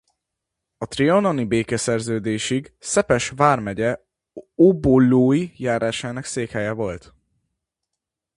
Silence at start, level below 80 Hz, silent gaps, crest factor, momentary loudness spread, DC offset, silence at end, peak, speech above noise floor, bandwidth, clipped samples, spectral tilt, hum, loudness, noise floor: 0.8 s; -48 dBFS; none; 20 dB; 12 LU; under 0.1%; 1.4 s; 0 dBFS; 64 dB; 11.5 kHz; under 0.1%; -5.5 dB/octave; none; -20 LUFS; -83 dBFS